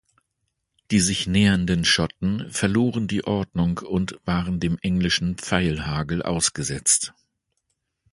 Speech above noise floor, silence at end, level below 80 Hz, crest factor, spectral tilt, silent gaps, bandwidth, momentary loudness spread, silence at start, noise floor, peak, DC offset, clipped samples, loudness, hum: 54 dB; 1.05 s; -42 dBFS; 22 dB; -4 dB/octave; none; 11.5 kHz; 7 LU; 0.9 s; -77 dBFS; -2 dBFS; under 0.1%; under 0.1%; -22 LUFS; none